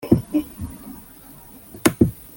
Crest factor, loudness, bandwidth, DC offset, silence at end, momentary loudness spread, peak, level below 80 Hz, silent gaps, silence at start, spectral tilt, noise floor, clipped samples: 24 dB; -21 LUFS; 17 kHz; under 0.1%; 0.25 s; 23 LU; 0 dBFS; -42 dBFS; none; 0 s; -6 dB/octave; -44 dBFS; under 0.1%